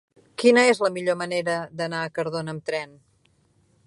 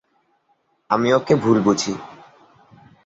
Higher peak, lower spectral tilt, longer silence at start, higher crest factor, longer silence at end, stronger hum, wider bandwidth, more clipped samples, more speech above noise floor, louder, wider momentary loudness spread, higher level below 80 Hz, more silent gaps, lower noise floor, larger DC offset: about the same, -4 dBFS vs -2 dBFS; about the same, -4.5 dB/octave vs -5.5 dB/octave; second, 0.4 s vs 0.9 s; about the same, 20 dB vs 20 dB; about the same, 1 s vs 0.9 s; neither; first, 11.5 kHz vs 8 kHz; neither; second, 41 dB vs 48 dB; second, -23 LUFS vs -18 LUFS; about the same, 13 LU vs 13 LU; second, -70 dBFS vs -58 dBFS; neither; about the same, -64 dBFS vs -65 dBFS; neither